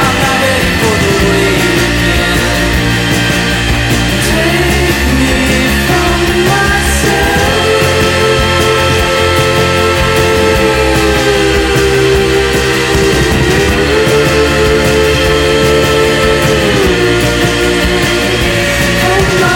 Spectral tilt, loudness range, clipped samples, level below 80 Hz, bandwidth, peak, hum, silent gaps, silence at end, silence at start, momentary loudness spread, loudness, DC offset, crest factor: -4.5 dB/octave; 1 LU; under 0.1%; -20 dBFS; 17 kHz; 0 dBFS; none; none; 0 s; 0 s; 1 LU; -9 LUFS; under 0.1%; 10 dB